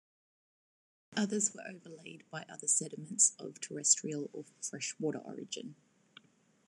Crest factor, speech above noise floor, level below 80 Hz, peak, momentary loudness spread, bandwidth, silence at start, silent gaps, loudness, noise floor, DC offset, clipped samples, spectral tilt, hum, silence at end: 26 dB; 27 dB; under -90 dBFS; -12 dBFS; 20 LU; 12.5 kHz; 1.1 s; none; -33 LUFS; -63 dBFS; under 0.1%; under 0.1%; -2 dB/octave; none; 0.95 s